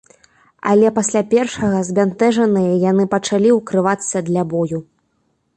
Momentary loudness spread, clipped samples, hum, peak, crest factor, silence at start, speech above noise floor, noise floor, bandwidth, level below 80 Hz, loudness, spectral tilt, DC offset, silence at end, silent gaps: 6 LU; under 0.1%; none; -2 dBFS; 14 dB; 0.65 s; 50 dB; -65 dBFS; 11 kHz; -54 dBFS; -16 LUFS; -5.5 dB/octave; under 0.1%; 0.75 s; none